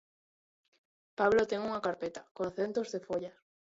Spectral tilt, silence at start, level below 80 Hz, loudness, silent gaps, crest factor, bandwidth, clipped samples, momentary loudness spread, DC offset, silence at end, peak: -5 dB/octave; 1.2 s; -68 dBFS; -33 LUFS; 2.31-2.35 s; 20 dB; 7.8 kHz; under 0.1%; 13 LU; under 0.1%; 0.4 s; -14 dBFS